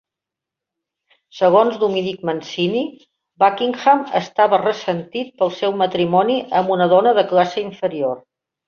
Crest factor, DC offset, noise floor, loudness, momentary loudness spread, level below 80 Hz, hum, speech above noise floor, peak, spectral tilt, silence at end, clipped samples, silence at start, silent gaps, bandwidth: 18 dB; under 0.1%; -86 dBFS; -18 LUFS; 10 LU; -64 dBFS; none; 68 dB; -2 dBFS; -6 dB/octave; 0.5 s; under 0.1%; 1.35 s; none; 7 kHz